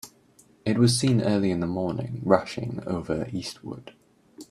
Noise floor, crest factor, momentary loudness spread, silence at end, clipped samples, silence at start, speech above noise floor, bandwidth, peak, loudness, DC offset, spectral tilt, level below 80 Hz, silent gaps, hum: -58 dBFS; 24 dB; 16 LU; 0.05 s; under 0.1%; 0.05 s; 33 dB; 13.5 kHz; -2 dBFS; -26 LUFS; under 0.1%; -6 dB/octave; -56 dBFS; none; none